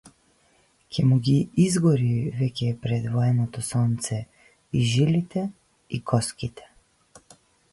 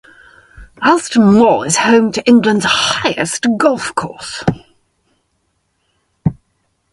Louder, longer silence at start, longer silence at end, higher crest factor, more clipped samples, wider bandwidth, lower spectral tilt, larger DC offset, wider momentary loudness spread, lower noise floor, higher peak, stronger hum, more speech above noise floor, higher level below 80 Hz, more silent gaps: second, -24 LUFS vs -13 LUFS; second, 0.05 s vs 0.6 s; first, 1.15 s vs 0.6 s; about the same, 16 dB vs 14 dB; neither; about the same, 11.5 kHz vs 11.5 kHz; first, -6.5 dB/octave vs -4 dB/octave; neither; about the same, 13 LU vs 11 LU; about the same, -63 dBFS vs -65 dBFS; second, -8 dBFS vs 0 dBFS; neither; second, 40 dB vs 52 dB; second, -54 dBFS vs -44 dBFS; neither